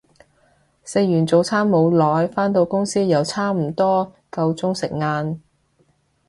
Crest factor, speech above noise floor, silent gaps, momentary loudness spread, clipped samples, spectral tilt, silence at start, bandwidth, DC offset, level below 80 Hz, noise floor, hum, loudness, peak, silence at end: 16 dB; 43 dB; none; 8 LU; under 0.1%; -6.5 dB/octave; 0.85 s; 11.5 kHz; under 0.1%; -58 dBFS; -62 dBFS; none; -19 LUFS; -4 dBFS; 0.9 s